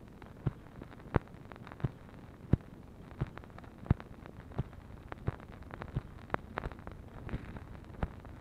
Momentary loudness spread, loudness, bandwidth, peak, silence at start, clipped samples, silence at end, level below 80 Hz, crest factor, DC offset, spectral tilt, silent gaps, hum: 16 LU; -41 LUFS; 11.5 kHz; -10 dBFS; 0 s; under 0.1%; 0 s; -48 dBFS; 30 dB; under 0.1%; -9 dB/octave; none; none